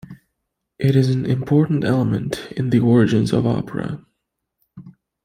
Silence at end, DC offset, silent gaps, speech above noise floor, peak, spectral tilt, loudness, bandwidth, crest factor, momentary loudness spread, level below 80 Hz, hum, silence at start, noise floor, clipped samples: 0.35 s; under 0.1%; none; 59 dB; -4 dBFS; -8 dB/octave; -19 LUFS; 15 kHz; 16 dB; 11 LU; -52 dBFS; none; 0.1 s; -77 dBFS; under 0.1%